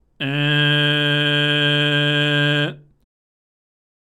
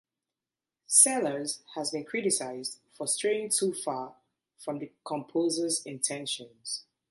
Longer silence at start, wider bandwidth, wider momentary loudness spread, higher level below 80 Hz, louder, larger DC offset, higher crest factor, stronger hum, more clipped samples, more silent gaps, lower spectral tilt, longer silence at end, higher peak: second, 0.2 s vs 0.9 s; about the same, 12 kHz vs 12 kHz; second, 5 LU vs 16 LU; first, -64 dBFS vs -82 dBFS; first, -17 LUFS vs -28 LUFS; neither; second, 14 dB vs 26 dB; neither; neither; neither; first, -5.5 dB/octave vs -2 dB/octave; first, 1.25 s vs 0.3 s; about the same, -6 dBFS vs -6 dBFS